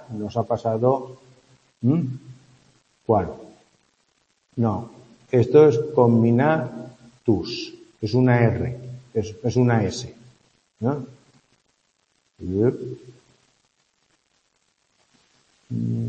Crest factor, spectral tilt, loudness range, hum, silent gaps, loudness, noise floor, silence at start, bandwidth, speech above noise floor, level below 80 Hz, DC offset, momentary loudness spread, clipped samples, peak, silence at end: 22 dB; -8 dB/octave; 11 LU; none; none; -22 LUFS; -68 dBFS; 0 s; 8.2 kHz; 48 dB; -56 dBFS; under 0.1%; 20 LU; under 0.1%; -2 dBFS; 0 s